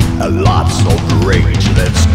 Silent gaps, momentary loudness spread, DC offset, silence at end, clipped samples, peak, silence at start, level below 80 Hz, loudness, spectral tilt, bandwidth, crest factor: none; 1 LU; under 0.1%; 0 s; under 0.1%; 0 dBFS; 0 s; -18 dBFS; -12 LUFS; -5.5 dB/octave; 15 kHz; 10 dB